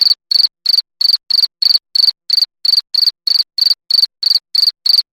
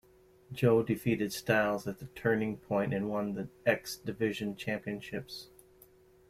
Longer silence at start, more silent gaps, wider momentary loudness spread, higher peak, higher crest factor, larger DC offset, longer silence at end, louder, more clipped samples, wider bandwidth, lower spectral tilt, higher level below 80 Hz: second, 0 s vs 0.5 s; neither; second, 3 LU vs 12 LU; first, -2 dBFS vs -12 dBFS; second, 12 dB vs 20 dB; neither; second, 0.1 s vs 0.85 s; first, -11 LUFS vs -33 LUFS; neither; first, 18 kHz vs 16 kHz; second, 5 dB/octave vs -6 dB/octave; second, -76 dBFS vs -64 dBFS